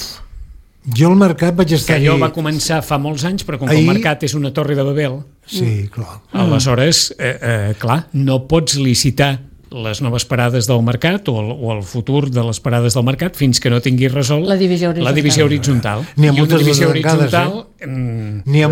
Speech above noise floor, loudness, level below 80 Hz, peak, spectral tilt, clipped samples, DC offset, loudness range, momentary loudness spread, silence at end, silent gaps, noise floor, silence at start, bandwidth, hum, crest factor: 21 dB; -15 LUFS; -40 dBFS; 0 dBFS; -5.5 dB/octave; under 0.1%; under 0.1%; 3 LU; 10 LU; 0 s; none; -35 dBFS; 0 s; 17 kHz; none; 14 dB